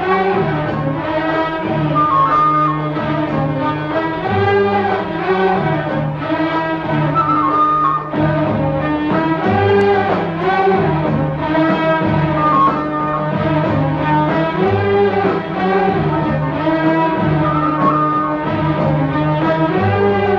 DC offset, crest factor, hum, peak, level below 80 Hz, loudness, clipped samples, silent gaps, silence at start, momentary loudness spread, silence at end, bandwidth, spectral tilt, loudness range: under 0.1%; 14 dB; none; -2 dBFS; -40 dBFS; -15 LUFS; under 0.1%; none; 0 s; 5 LU; 0 s; 6.2 kHz; -9 dB/octave; 1 LU